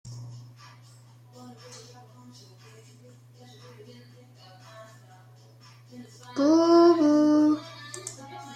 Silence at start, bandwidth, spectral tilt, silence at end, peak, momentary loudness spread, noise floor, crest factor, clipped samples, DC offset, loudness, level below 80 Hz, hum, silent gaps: 0.05 s; 10.5 kHz; -6 dB/octave; 0 s; -10 dBFS; 29 LU; -52 dBFS; 18 dB; under 0.1%; under 0.1%; -21 LUFS; -74 dBFS; none; none